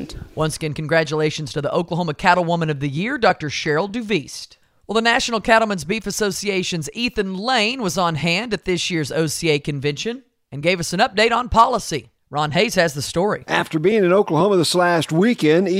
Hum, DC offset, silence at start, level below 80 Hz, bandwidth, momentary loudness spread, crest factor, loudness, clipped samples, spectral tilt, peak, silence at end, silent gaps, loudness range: none; under 0.1%; 0 s; -46 dBFS; 16 kHz; 8 LU; 20 dB; -19 LUFS; under 0.1%; -4.5 dB/octave; 0 dBFS; 0 s; none; 3 LU